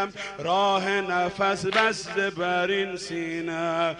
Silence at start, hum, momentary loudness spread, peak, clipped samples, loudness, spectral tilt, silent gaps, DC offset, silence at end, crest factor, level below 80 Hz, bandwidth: 0 s; none; 8 LU; -10 dBFS; under 0.1%; -25 LUFS; -4 dB/octave; none; under 0.1%; 0 s; 16 dB; -60 dBFS; 11 kHz